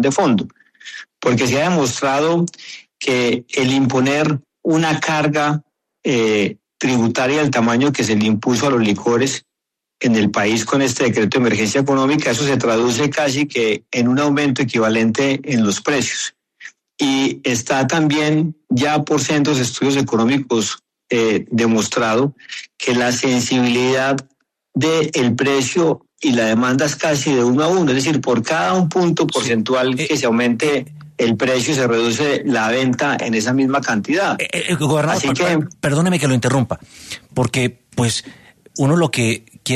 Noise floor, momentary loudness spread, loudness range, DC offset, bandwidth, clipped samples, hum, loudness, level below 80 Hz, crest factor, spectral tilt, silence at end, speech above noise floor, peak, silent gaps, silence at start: -81 dBFS; 6 LU; 2 LU; under 0.1%; 13.5 kHz; under 0.1%; none; -17 LUFS; -54 dBFS; 14 dB; -4.5 dB/octave; 0 s; 65 dB; -4 dBFS; none; 0 s